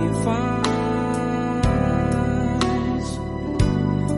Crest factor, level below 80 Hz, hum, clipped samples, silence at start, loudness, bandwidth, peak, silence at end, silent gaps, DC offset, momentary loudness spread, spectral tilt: 18 dB; -32 dBFS; none; under 0.1%; 0 s; -22 LUFS; 11.5 kHz; -4 dBFS; 0 s; none; under 0.1%; 5 LU; -6.5 dB/octave